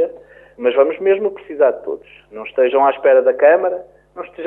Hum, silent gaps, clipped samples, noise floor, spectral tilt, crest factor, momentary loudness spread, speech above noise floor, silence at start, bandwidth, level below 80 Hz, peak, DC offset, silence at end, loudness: none; none; under 0.1%; -38 dBFS; -7.5 dB/octave; 14 dB; 17 LU; 23 dB; 0 s; 3.7 kHz; -60 dBFS; -2 dBFS; under 0.1%; 0 s; -15 LUFS